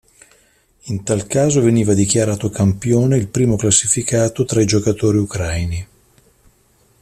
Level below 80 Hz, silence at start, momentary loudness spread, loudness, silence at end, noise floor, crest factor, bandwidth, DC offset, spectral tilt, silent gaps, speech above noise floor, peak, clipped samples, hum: -42 dBFS; 0.85 s; 8 LU; -16 LUFS; 1.15 s; -56 dBFS; 18 dB; 14 kHz; under 0.1%; -5 dB/octave; none; 40 dB; 0 dBFS; under 0.1%; none